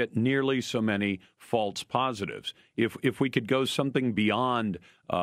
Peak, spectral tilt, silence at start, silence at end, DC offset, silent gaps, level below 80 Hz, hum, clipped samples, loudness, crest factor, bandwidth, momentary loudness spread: -10 dBFS; -5.5 dB/octave; 0 s; 0 s; under 0.1%; none; -66 dBFS; none; under 0.1%; -28 LUFS; 18 dB; 15 kHz; 9 LU